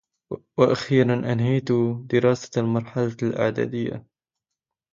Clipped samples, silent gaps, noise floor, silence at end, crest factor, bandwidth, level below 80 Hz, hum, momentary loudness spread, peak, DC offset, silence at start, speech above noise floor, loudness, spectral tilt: under 0.1%; none; -86 dBFS; 0.9 s; 20 dB; 7.6 kHz; -60 dBFS; none; 11 LU; -4 dBFS; under 0.1%; 0.3 s; 64 dB; -23 LUFS; -7.5 dB/octave